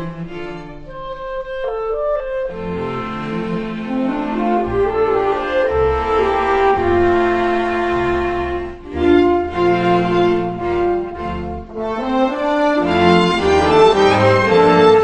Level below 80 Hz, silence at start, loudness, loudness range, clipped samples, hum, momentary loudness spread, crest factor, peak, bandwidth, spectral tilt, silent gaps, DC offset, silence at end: -36 dBFS; 0 s; -16 LUFS; 8 LU; under 0.1%; none; 14 LU; 16 dB; 0 dBFS; 9.4 kHz; -6.5 dB/octave; none; under 0.1%; 0 s